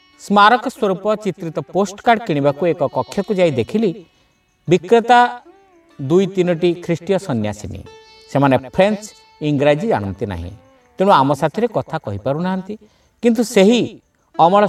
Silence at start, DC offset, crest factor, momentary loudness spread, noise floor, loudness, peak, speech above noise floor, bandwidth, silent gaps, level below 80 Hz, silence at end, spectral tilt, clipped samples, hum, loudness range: 0.2 s; under 0.1%; 16 dB; 14 LU; -59 dBFS; -17 LUFS; 0 dBFS; 43 dB; 14.5 kHz; none; -50 dBFS; 0 s; -6 dB/octave; under 0.1%; none; 2 LU